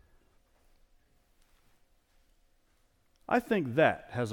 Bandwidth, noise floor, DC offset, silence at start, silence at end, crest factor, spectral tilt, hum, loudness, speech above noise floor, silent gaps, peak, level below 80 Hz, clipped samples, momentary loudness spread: 18.5 kHz; -69 dBFS; under 0.1%; 3.3 s; 0 s; 24 dB; -6.5 dB/octave; none; -29 LUFS; 40 dB; none; -12 dBFS; -66 dBFS; under 0.1%; 5 LU